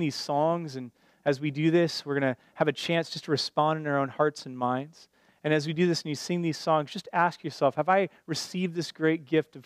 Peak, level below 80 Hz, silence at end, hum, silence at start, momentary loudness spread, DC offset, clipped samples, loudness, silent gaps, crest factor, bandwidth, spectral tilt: -8 dBFS; -78 dBFS; 0.05 s; none; 0 s; 7 LU; under 0.1%; under 0.1%; -28 LUFS; none; 20 dB; 15 kHz; -5.5 dB/octave